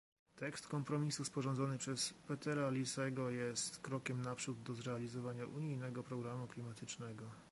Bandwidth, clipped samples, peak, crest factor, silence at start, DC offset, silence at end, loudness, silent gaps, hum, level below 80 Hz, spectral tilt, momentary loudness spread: 11.5 kHz; under 0.1%; -26 dBFS; 16 dB; 0.35 s; under 0.1%; 0 s; -43 LUFS; none; none; -78 dBFS; -4.5 dB/octave; 9 LU